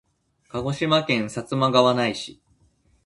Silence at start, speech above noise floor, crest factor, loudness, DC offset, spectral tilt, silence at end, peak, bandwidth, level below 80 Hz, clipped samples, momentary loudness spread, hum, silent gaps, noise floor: 0.55 s; 40 dB; 20 dB; -22 LUFS; under 0.1%; -5.5 dB/octave; 0.7 s; -4 dBFS; 11.5 kHz; -56 dBFS; under 0.1%; 15 LU; none; none; -62 dBFS